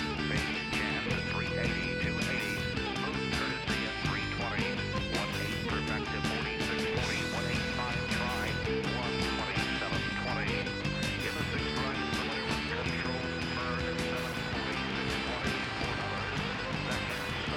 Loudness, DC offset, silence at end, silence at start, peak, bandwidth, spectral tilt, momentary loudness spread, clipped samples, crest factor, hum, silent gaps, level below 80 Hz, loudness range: -32 LUFS; under 0.1%; 0 s; 0 s; -20 dBFS; 18 kHz; -4.5 dB/octave; 2 LU; under 0.1%; 12 dB; none; none; -46 dBFS; 1 LU